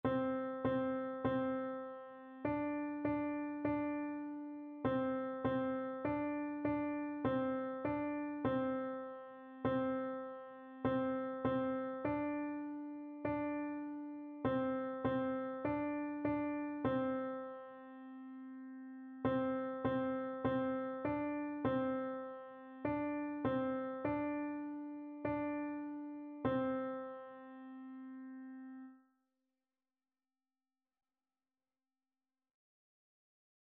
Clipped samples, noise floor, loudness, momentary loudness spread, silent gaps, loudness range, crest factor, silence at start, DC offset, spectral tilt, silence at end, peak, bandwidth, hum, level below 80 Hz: under 0.1%; under -90 dBFS; -40 LUFS; 14 LU; none; 5 LU; 18 dB; 0.05 s; under 0.1%; -6.5 dB/octave; 4.75 s; -24 dBFS; 4.3 kHz; none; -68 dBFS